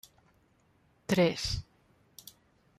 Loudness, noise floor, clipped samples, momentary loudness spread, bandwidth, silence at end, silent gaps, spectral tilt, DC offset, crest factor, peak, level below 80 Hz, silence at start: -30 LUFS; -68 dBFS; under 0.1%; 24 LU; 15.5 kHz; 1.15 s; none; -5 dB/octave; under 0.1%; 22 dB; -14 dBFS; -52 dBFS; 1.1 s